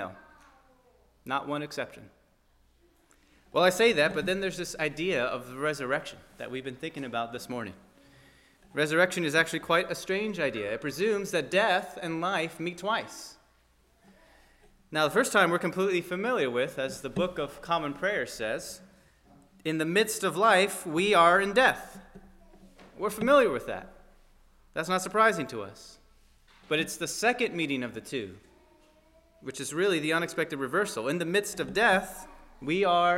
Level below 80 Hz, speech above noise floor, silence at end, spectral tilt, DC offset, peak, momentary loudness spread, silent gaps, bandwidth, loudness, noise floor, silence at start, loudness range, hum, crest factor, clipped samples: -60 dBFS; 37 dB; 0 s; -4 dB/octave; under 0.1%; -8 dBFS; 15 LU; none; 16 kHz; -28 LUFS; -65 dBFS; 0 s; 7 LU; none; 22 dB; under 0.1%